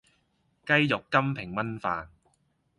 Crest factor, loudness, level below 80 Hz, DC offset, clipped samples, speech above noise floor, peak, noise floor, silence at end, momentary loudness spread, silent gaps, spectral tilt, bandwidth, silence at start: 24 dB; -27 LUFS; -60 dBFS; under 0.1%; under 0.1%; 44 dB; -6 dBFS; -71 dBFS; 0.7 s; 10 LU; none; -6.5 dB/octave; 11.5 kHz; 0.65 s